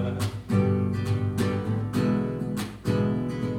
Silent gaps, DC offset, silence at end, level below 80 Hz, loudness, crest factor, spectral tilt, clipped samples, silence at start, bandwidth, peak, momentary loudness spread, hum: none; under 0.1%; 0 s; -50 dBFS; -27 LUFS; 16 dB; -7.5 dB/octave; under 0.1%; 0 s; 16 kHz; -10 dBFS; 6 LU; none